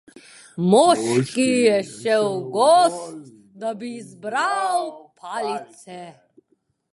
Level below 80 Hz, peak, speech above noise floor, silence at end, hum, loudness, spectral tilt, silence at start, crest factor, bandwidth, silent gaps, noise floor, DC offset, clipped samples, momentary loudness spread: -70 dBFS; -2 dBFS; 47 dB; 0.85 s; none; -20 LUFS; -4.5 dB/octave; 0.55 s; 18 dB; 11.5 kHz; none; -68 dBFS; under 0.1%; under 0.1%; 23 LU